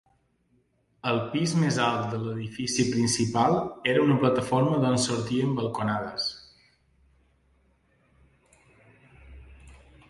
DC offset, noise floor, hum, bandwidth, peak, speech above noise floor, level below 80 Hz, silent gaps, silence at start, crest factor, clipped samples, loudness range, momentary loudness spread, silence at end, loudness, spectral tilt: under 0.1%; -68 dBFS; none; 11.5 kHz; -8 dBFS; 43 dB; -58 dBFS; none; 1.05 s; 20 dB; under 0.1%; 10 LU; 8 LU; 0.35 s; -26 LUFS; -5 dB/octave